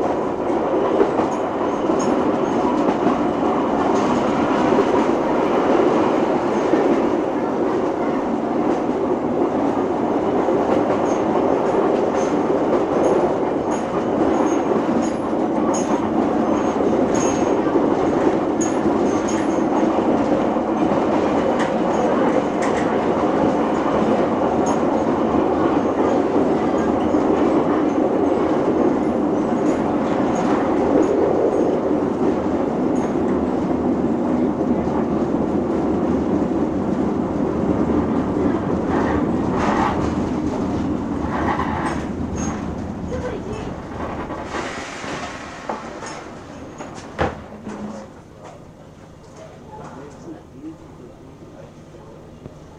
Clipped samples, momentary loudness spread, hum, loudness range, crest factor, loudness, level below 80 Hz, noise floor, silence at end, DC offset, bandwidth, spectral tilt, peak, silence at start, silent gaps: under 0.1%; 11 LU; none; 11 LU; 16 dB; -19 LUFS; -44 dBFS; -41 dBFS; 0 s; under 0.1%; 10.5 kHz; -6.5 dB/octave; -2 dBFS; 0 s; none